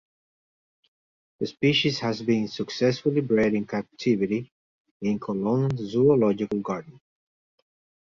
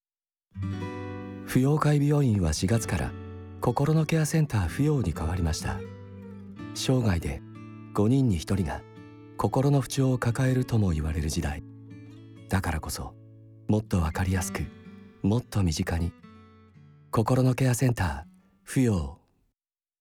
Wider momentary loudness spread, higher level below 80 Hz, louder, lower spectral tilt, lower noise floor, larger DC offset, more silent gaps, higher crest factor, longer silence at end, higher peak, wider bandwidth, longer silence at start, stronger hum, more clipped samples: second, 10 LU vs 19 LU; second, -60 dBFS vs -44 dBFS; about the same, -25 LUFS vs -27 LUFS; about the same, -6.5 dB/octave vs -6.5 dB/octave; about the same, under -90 dBFS vs under -90 dBFS; neither; first, 4.51-4.85 s, 4.91-5.00 s vs none; about the same, 18 dB vs 18 dB; first, 1.1 s vs 0.85 s; about the same, -8 dBFS vs -10 dBFS; second, 7.4 kHz vs 18 kHz; first, 1.4 s vs 0.55 s; neither; neither